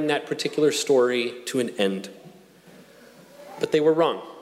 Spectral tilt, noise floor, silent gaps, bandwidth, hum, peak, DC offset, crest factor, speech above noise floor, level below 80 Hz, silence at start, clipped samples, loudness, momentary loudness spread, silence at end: -4 dB/octave; -50 dBFS; none; 15.5 kHz; none; -8 dBFS; under 0.1%; 16 dB; 27 dB; -72 dBFS; 0 s; under 0.1%; -23 LUFS; 12 LU; 0 s